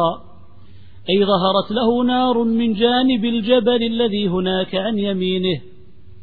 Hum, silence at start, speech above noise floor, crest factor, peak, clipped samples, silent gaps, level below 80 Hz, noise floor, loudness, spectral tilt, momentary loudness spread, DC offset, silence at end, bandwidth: none; 0 s; 29 dB; 16 dB; -4 dBFS; under 0.1%; none; -50 dBFS; -46 dBFS; -18 LUFS; -9 dB/octave; 5 LU; 1%; 0.6 s; 4.7 kHz